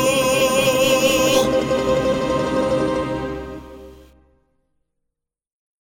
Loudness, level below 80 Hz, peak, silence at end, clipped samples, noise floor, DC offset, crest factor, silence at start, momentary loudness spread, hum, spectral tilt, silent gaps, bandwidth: -18 LUFS; -42 dBFS; -4 dBFS; 1.9 s; under 0.1%; -80 dBFS; under 0.1%; 16 dB; 0 s; 12 LU; none; -3.5 dB/octave; none; 17.5 kHz